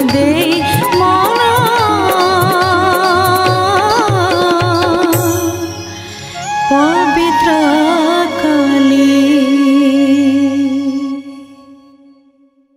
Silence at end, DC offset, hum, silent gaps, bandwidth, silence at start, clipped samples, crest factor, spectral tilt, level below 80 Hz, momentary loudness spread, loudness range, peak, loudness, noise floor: 1 s; under 0.1%; none; none; 16 kHz; 0 s; under 0.1%; 10 dB; -5 dB/octave; -46 dBFS; 9 LU; 3 LU; 0 dBFS; -11 LUFS; -51 dBFS